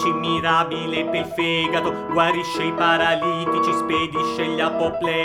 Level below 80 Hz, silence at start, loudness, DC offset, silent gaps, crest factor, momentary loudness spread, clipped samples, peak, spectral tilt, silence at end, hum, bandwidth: -54 dBFS; 0 s; -21 LUFS; under 0.1%; none; 18 dB; 5 LU; under 0.1%; -2 dBFS; -5 dB/octave; 0 s; none; 14 kHz